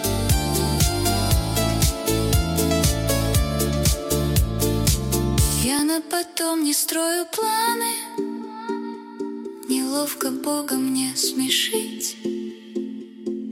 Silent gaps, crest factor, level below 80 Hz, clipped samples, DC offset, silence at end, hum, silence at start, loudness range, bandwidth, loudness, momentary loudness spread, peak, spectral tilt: none; 16 dB; -30 dBFS; under 0.1%; under 0.1%; 0 s; none; 0 s; 4 LU; 17 kHz; -22 LUFS; 11 LU; -6 dBFS; -4 dB/octave